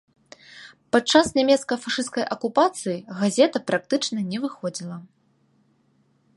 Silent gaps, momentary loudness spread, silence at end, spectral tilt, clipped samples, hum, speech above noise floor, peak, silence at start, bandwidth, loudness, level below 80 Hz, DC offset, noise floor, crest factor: none; 15 LU; 1.3 s; -4 dB/octave; under 0.1%; none; 42 dB; -2 dBFS; 0.55 s; 11.5 kHz; -22 LUFS; -62 dBFS; under 0.1%; -64 dBFS; 22 dB